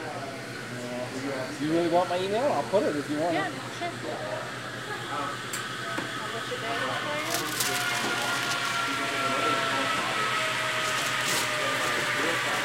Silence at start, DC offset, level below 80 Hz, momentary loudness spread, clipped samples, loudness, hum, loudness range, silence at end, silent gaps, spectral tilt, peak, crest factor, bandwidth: 0 s; under 0.1%; -66 dBFS; 9 LU; under 0.1%; -28 LUFS; none; 6 LU; 0 s; none; -3 dB/octave; -12 dBFS; 18 dB; 16 kHz